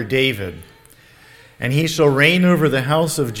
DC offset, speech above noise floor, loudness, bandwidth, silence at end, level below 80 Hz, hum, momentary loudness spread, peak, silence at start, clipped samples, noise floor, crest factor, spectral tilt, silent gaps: under 0.1%; 31 dB; -16 LUFS; 17.5 kHz; 0 s; -50 dBFS; none; 13 LU; 0 dBFS; 0 s; under 0.1%; -48 dBFS; 18 dB; -5 dB/octave; none